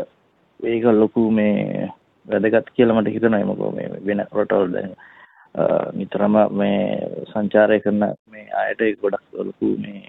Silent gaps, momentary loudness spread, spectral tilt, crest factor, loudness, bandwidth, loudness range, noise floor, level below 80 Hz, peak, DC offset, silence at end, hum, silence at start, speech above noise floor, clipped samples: 8.19-8.25 s; 11 LU; -10 dB/octave; 18 dB; -20 LUFS; 4 kHz; 3 LU; -60 dBFS; -60 dBFS; -2 dBFS; under 0.1%; 0.1 s; none; 0 s; 40 dB; under 0.1%